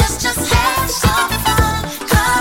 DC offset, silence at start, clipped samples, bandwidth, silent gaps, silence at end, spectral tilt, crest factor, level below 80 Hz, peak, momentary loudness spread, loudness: under 0.1%; 0 s; under 0.1%; 17 kHz; none; 0 s; -3.5 dB/octave; 14 dB; -24 dBFS; 0 dBFS; 3 LU; -15 LUFS